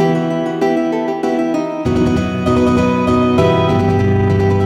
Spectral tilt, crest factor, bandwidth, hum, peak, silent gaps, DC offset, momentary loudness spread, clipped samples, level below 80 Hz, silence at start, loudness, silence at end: -7.5 dB/octave; 14 dB; 11 kHz; none; 0 dBFS; none; under 0.1%; 5 LU; under 0.1%; -34 dBFS; 0 s; -15 LUFS; 0 s